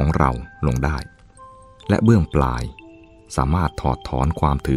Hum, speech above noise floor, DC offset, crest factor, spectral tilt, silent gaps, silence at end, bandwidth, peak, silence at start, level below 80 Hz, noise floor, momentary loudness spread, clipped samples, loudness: none; 26 dB; under 0.1%; 18 dB; -7.5 dB/octave; none; 0 s; 13.5 kHz; -2 dBFS; 0 s; -28 dBFS; -45 dBFS; 13 LU; under 0.1%; -21 LUFS